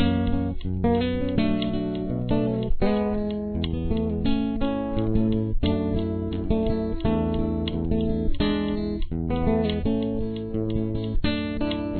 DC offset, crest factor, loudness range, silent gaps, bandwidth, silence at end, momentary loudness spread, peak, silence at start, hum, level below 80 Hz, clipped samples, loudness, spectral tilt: under 0.1%; 14 dB; 1 LU; none; 4.5 kHz; 0 s; 4 LU; -10 dBFS; 0 s; none; -32 dBFS; under 0.1%; -26 LUFS; -11 dB/octave